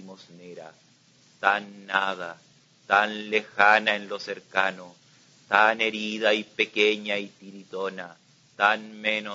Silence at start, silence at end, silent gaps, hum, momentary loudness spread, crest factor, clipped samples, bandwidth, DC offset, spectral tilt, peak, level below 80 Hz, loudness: 0 s; 0 s; none; none; 20 LU; 24 dB; under 0.1%; 7.8 kHz; under 0.1%; -3 dB/octave; -2 dBFS; -78 dBFS; -24 LUFS